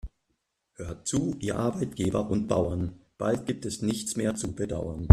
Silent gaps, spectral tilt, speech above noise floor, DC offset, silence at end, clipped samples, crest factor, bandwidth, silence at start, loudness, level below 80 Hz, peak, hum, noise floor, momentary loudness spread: none; -6.5 dB/octave; 52 dB; under 0.1%; 0 s; under 0.1%; 26 dB; 14 kHz; 0.05 s; -30 LUFS; -46 dBFS; -2 dBFS; none; -78 dBFS; 7 LU